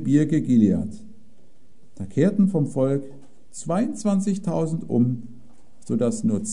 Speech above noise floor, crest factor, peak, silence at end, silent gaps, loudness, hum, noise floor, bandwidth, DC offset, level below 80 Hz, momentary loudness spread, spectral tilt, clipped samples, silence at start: 37 dB; 18 dB; -6 dBFS; 0 s; none; -23 LUFS; none; -59 dBFS; 11 kHz; 1%; -58 dBFS; 15 LU; -7.5 dB/octave; under 0.1%; 0 s